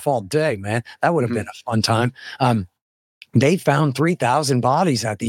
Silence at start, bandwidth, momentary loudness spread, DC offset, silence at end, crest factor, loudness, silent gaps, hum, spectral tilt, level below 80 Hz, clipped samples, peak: 0 s; 16.5 kHz; 7 LU; under 0.1%; 0 s; 16 dB; -20 LUFS; 2.82-3.21 s; none; -5.5 dB/octave; -58 dBFS; under 0.1%; -4 dBFS